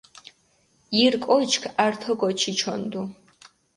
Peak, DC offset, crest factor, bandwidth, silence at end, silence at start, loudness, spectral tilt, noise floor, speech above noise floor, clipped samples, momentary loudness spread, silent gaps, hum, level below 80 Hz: -4 dBFS; under 0.1%; 20 dB; 11.5 kHz; 0.65 s; 0.9 s; -23 LUFS; -3 dB/octave; -64 dBFS; 41 dB; under 0.1%; 11 LU; none; none; -66 dBFS